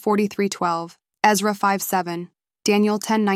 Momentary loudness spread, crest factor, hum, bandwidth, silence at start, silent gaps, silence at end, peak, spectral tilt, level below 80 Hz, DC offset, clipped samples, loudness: 12 LU; 20 dB; none; 15.5 kHz; 0.05 s; none; 0 s; -2 dBFS; -4.5 dB/octave; -68 dBFS; under 0.1%; under 0.1%; -21 LUFS